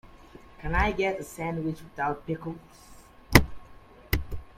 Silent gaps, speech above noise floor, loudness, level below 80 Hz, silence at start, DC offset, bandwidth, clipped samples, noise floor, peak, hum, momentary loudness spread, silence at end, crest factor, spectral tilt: none; 20 dB; -28 LUFS; -38 dBFS; 0.15 s; under 0.1%; 16.5 kHz; under 0.1%; -50 dBFS; 0 dBFS; none; 18 LU; 0.1 s; 28 dB; -5 dB/octave